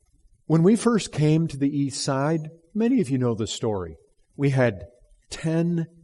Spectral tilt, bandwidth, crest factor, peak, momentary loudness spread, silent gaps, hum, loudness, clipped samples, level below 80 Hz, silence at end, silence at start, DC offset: -6.5 dB/octave; 11.5 kHz; 18 dB; -6 dBFS; 11 LU; none; none; -24 LUFS; under 0.1%; -56 dBFS; 0.15 s; 0.5 s; under 0.1%